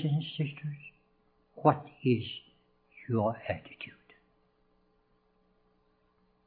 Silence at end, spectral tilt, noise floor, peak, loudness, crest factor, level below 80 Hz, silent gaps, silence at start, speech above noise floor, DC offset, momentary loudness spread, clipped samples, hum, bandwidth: 2.55 s; -10.5 dB/octave; -71 dBFS; -10 dBFS; -32 LUFS; 26 dB; -72 dBFS; none; 0 s; 40 dB; under 0.1%; 18 LU; under 0.1%; none; 4.6 kHz